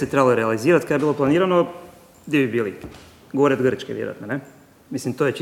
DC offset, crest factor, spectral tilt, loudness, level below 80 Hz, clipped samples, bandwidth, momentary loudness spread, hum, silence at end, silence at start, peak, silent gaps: under 0.1%; 18 dB; -6.5 dB/octave; -21 LUFS; -58 dBFS; under 0.1%; 16 kHz; 12 LU; none; 0 s; 0 s; -2 dBFS; none